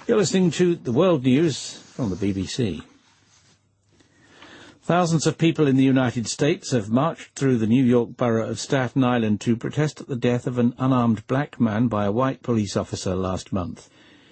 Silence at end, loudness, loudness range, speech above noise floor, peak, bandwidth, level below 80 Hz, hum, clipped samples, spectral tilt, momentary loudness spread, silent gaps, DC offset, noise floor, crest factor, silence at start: 0.5 s; -22 LUFS; 6 LU; 40 dB; -6 dBFS; 8.8 kHz; -56 dBFS; none; under 0.1%; -6 dB/octave; 8 LU; none; under 0.1%; -61 dBFS; 18 dB; 0.1 s